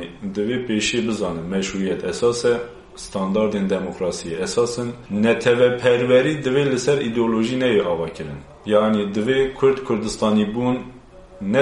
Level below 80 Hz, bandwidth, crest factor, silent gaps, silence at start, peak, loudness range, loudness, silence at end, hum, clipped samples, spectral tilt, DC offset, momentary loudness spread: -48 dBFS; 11.5 kHz; 18 dB; none; 0 s; -2 dBFS; 4 LU; -20 LUFS; 0 s; none; under 0.1%; -5 dB/octave; under 0.1%; 11 LU